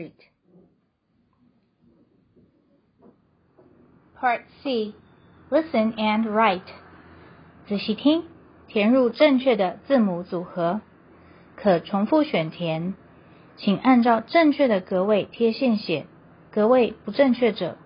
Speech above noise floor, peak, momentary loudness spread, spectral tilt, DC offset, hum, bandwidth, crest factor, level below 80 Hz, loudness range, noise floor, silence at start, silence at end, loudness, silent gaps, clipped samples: 46 dB; -4 dBFS; 11 LU; -10.5 dB/octave; under 0.1%; none; 5.4 kHz; 20 dB; -64 dBFS; 8 LU; -68 dBFS; 0 s; 0.1 s; -22 LUFS; none; under 0.1%